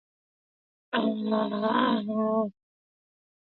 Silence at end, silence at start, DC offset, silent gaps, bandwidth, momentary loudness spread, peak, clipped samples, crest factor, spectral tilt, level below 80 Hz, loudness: 0.9 s; 0.9 s; under 0.1%; none; 4.4 kHz; 5 LU; -10 dBFS; under 0.1%; 20 dB; -9.5 dB/octave; -76 dBFS; -27 LUFS